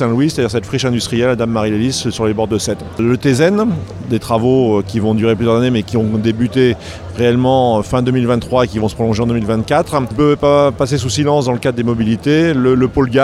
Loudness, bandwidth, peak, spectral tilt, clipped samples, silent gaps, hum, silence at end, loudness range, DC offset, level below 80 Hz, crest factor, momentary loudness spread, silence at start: -14 LUFS; 14 kHz; 0 dBFS; -6 dB/octave; under 0.1%; none; none; 0 s; 2 LU; under 0.1%; -38 dBFS; 14 dB; 5 LU; 0 s